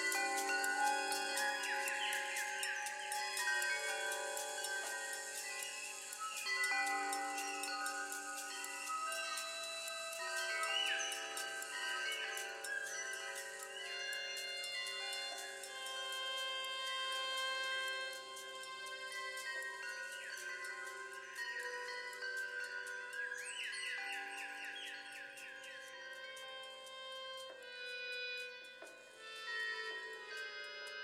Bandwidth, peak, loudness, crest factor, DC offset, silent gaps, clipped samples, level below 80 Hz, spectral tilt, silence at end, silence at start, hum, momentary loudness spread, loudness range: 16 kHz; -24 dBFS; -41 LUFS; 20 dB; under 0.1%; none; under 0.1%; under -90 dBFS; 2 dB/octave; 0 s; 0 s; none; 12 LU; 8 LU